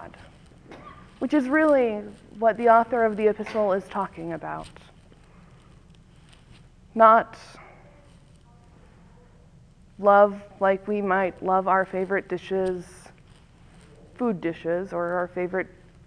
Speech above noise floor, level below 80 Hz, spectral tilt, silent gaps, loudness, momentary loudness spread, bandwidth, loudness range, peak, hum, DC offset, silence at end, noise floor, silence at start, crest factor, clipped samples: 30 dB; -56 dBFS; -7 dB/octave; none; -23 LUFS; 19 LU; 11 kHz; 7 LU; -2 dBFS; none; under 0.1%; 0.4 s; -53 dBFS; 0 s; 24 dB; under 0.1%